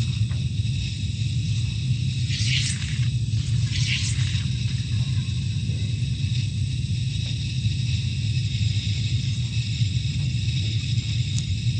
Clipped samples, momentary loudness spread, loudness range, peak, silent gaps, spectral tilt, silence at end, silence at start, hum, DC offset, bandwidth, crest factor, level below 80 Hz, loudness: under 0.1%; 3 LU; 2 LU; -8 dBFS; none; -4.5 dB/octave; 0 s; 0 s; none; under 0.1%; 9.2 kHz; 16 dB; -36 dBFS; -25 LUFS